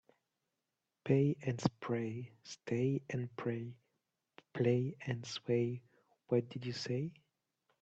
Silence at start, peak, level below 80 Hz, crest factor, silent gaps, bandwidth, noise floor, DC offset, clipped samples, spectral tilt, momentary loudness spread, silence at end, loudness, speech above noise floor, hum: 1.05 s; -16 dBFS; -76 dBFS; 22 dB; none; 8.2 kHz; -89 dBFS; under 0.1%; under 0.1%; -7 dB/octave; 15 LU; 0.7 s; -37 LUFS; 52 dB; none